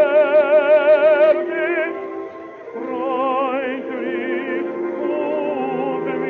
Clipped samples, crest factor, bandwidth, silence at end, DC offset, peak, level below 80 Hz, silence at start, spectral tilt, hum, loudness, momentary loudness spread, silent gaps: under 0.1%; 14 dB; 4.4 kHz; 0 s; under 0.1%; -4 dBFS; -74 dBFS; 0 s; -7 dB/octave; none; -18 LUFS; 15 LU; none